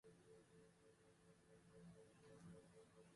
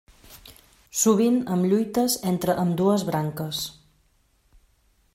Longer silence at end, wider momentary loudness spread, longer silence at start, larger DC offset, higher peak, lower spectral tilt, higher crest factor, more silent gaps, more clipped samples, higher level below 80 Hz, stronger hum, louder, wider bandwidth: second, 0 s vs 1.45 s; second, 5 LU vs 9 LU; second, 0.05 s vs 0.3 s; neither; second, -52 dBFS vs -8 dBFS; about the same, -5.5 dB/octave vs -5 dB/octave; about the same, 14 dB vs 16 dB; neither; neither; second, -86 dBFS vs -58 dBFS; neither; second, -67 LUFS vs -23 LUFS; second, 11.5 kHz vs 16 kHz